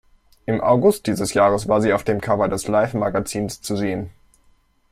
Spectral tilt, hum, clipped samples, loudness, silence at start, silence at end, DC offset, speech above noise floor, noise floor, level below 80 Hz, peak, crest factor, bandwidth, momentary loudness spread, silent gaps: -5.5 dB/octave; none; under 0.1%; -20 LUFS; 0.5 s; 0.8 s; under 0.1%; 39 dB; -58 dBFS; -48 dBFS; -4 dBFS; 16 dB; 16 kHz; 9 LU; none